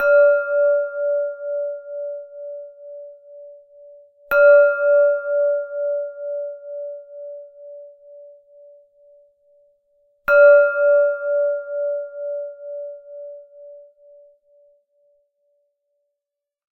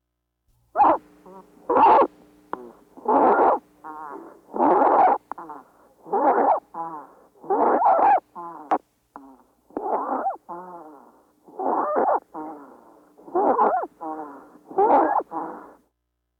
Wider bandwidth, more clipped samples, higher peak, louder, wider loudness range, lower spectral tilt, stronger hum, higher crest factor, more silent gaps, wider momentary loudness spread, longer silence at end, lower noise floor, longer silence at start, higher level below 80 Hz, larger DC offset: first, 5.8 kHz vs 4.9 kHz; neither; first, -2 dBFS vs -8 dBFS; first, -18 LUFS vs -21 LUFS; first, 17 LU vs 7 LU; second, 0 dB/octave vs -7.5 dB/octave; neither; about the same, 18 dB vs 16 dB; neither; first, 26 LU vs 21 LU; first, 2.95 s vs 0.8 s; first, -85 dBFS vs -77 dBFS; second, 0 s vs 0.75 s; about the same, -66 dBFS vs -66 dBFS; neither